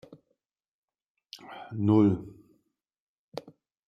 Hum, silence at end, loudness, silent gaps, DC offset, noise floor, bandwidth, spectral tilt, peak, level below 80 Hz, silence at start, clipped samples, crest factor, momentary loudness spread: none; 0.5 s; -25 LUFS; 3.00-3.32 s; under 0.1%; -79 dBFS; 6.8 kHz; -9 dB/octave; -10 dBFS; -68 dBFS; 1.35 s; under 0.1%; 22 dB; 25 LU